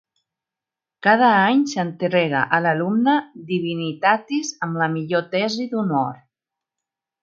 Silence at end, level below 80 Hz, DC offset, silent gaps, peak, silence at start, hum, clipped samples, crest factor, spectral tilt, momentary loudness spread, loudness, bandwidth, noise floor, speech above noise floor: 1.05 s; -72 dBFS; under 0.1%; none; 0 dBFS; 1.05 s; none; under 0.1%; 20 dB; -5.5 dB/octave; 10 LU; -20 LUFS; 7.6 kHz; -88 dBFS; 68 dB